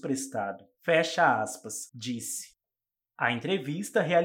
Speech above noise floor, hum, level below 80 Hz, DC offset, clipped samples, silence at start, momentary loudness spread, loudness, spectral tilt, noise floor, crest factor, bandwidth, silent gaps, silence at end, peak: over 61 dB; none; -82 dBFS; under 0.1%; under 0.1%; 0.05 s; 12 LU; -29 LUFS; -4 dB/octave; under -90 dBFS; 20 dB; 18 kHz; none; 0 s; -10 dBFS